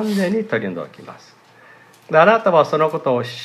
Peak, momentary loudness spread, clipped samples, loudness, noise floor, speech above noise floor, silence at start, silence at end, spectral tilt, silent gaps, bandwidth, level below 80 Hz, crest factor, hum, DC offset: 0 dBFS; 15 LU; under 0.1%; -17 LUFS; -47 dBFS; 30 dB; 0 s; 0 s; -6 dB/octave; none; 14 kHz; -70 dBFS; 18 dB; none; under 0.1%